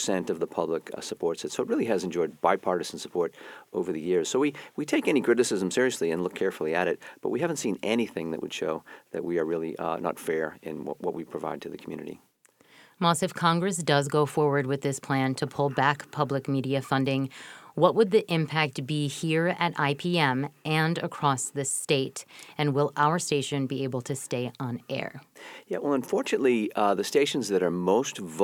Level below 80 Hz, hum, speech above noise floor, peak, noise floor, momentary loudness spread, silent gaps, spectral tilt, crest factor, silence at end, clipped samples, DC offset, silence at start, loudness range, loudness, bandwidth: -70 dBFS; none; 33 dB; -6 dBFS; -61 dBFS; 10 LU; none; -5 dB/octave; 22 dB; 0 s; under 0.1%; under 0.1%; 0 s; 5 LU; -27 LUFS; 18.5 kHz